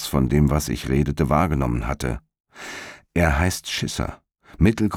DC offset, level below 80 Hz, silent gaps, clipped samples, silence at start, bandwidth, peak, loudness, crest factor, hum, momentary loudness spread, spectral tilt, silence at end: under 0.1%; -32 dBFS; 2.40-2.44 s; under 0.1%; 0 s; 17.5 kHz; -6 dBFS; -22 LUFS; 16 dB; none; 15 LU; -6 dB/octave; 0 s